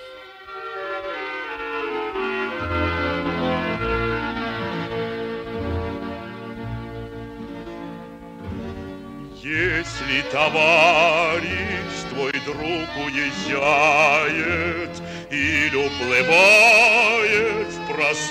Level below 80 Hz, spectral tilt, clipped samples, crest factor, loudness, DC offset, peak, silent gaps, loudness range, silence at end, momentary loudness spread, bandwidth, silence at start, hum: -44 dBFS; -4 dB/octave; under 0.1%; 18 dB; -19 LUFS; under 0.1%; -4 dBFS; none; 15 LU; 0 s; 20 LU; 16 kHz; 0 s; none